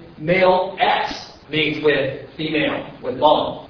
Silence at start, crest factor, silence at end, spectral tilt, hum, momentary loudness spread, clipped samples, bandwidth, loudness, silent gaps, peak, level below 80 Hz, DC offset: 0 s; 18 dB; 0 s; -6 dB/octave; none; 11 LU; under 0.1%; 5.4 kHz; -19 LUFS; none; 0 dBFS; -50 dBFS; under 0.1%